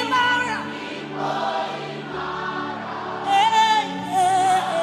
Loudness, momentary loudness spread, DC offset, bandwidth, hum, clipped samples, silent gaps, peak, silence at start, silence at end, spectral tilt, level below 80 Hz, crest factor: -22 LUFS; 12 LU; under 0.1%; 13.5 kHz; none; under 0.1%; none; -6 dBFS; 0 s; 0 s; -3 dB/octave; -62 dBFS; 16 dB